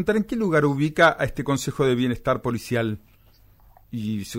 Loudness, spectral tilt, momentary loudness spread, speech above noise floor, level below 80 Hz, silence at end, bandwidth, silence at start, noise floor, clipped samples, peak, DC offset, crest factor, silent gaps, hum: -23 LUFS; -6 dB/octave; 11 LU; 32 dB; -46 dBFS; 0 s; 16 kHz; 0 s; -54 dBFS; under 0.1%; -6 dBFS; under 0.1%; 18 dB; none; none